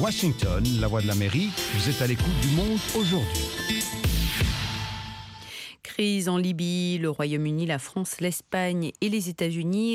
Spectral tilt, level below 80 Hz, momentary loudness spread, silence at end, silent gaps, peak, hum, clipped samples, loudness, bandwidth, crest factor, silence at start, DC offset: -5 dB/octave; -36 dBFS; 7 LU; 0 s; none; -12 dBFS; none; under 0.1%; -26 LUFS; 16.5 kHz; 14 dB; 0 s; under 0.1%